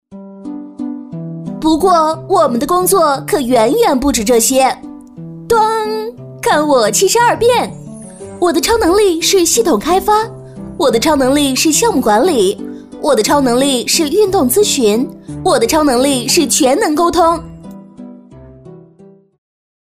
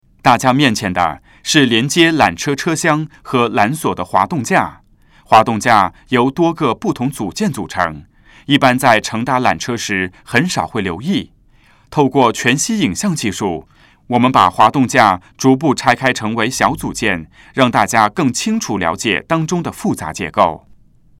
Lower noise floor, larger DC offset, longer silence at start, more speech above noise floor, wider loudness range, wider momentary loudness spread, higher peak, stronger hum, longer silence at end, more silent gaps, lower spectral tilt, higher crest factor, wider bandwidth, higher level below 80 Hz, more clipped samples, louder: second, -43 dBFS vs -49 dBFS; neither; second, 0.1 s vs 0.25 s; second, 31 dB vs 35 dB; about the same, 2 LU vs 3 LU; first, 17 LU vs 9 LU; about the same, -2 dBFS vs 0 dBFS; neither; first, 1.2 s vs 0.6 s; neither; second, -3 dB/octave vs -4.5 dB/octave; about the same, 12 dB vs 16 dB; about the same, 16 kHz vs 16.5 kHz; first, -40 dBFS vs -48 dBFS; second, under 0.1% vs 0.1%; first, -12 LUFS vs -15 LUFS